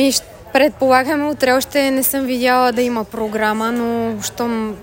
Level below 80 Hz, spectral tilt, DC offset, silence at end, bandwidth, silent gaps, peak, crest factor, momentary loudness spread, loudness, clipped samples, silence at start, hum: -48 dBFS; -3 dB/octave; under 0.1%; 0 s; 17 kHz; none; -2 dBFS; 16 dB; 7 LU; -17 LUFS; under 0.1%; 0 s; none